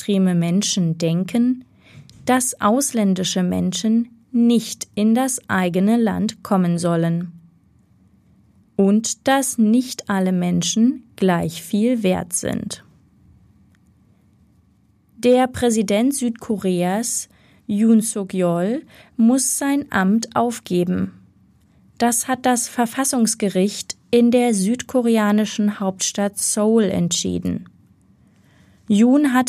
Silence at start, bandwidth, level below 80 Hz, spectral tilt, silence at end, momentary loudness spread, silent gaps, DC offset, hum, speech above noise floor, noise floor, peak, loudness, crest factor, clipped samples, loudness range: 0 s; 15.5 kHz; -58 dBFS; -5 dB/octave; 0 s; 8 LU; none; under 0.1%; none; 39 dB; -58 dBFS; -4 dBFS; -19 LUFS; 16 dB; under 0.1%; 3 LU